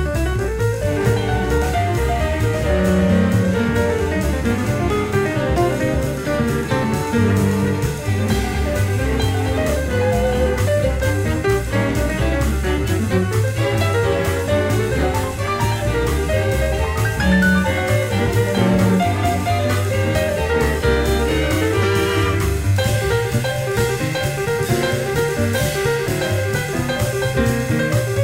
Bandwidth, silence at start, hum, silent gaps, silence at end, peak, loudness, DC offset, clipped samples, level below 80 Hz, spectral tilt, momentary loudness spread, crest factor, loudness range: 16.5 kHz; 0 s; none; none; 0 s; -4 dBFS; -19 LUFS; under 0.1%; under 0.1%; -28 dBFS; -6 dB/octave; 4 LU; 14 dB; 2 LU